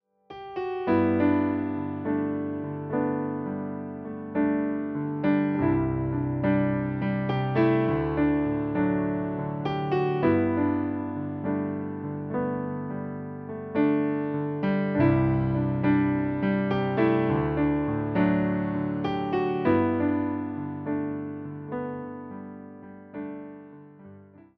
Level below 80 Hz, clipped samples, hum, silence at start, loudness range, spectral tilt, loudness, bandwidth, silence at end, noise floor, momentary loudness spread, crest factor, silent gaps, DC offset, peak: -50 dBFS; under 0.1%; none; 0.3 s; 5 LU; -7.5 dB/octave; -27 LUFS; 5.2 kHz; 0.35 s; -50 dBFS; 13 LU; 16 dB; none; under 0.1%; -10 dBFS